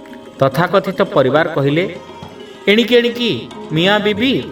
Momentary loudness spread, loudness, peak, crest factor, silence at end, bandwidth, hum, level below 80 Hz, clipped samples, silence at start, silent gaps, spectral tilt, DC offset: 18 LU; -15 LUFS; 0 dBFS; 16 dB; 0 s; 17.5 kHz; none; -54 dBFS; under 0.1%; 0 s; none; -6 dB/octave; under 0.1%